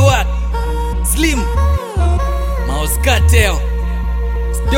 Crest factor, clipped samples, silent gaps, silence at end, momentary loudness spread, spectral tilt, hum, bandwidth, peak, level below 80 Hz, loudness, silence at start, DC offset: 14 dB; under 0.1%; none; 0 s; 8 LU; -4.5 dB/octave; none; 16.5 kHz; 0 dBFS; -16 dBFS; -16 LUFS; 0 s; under 0.1%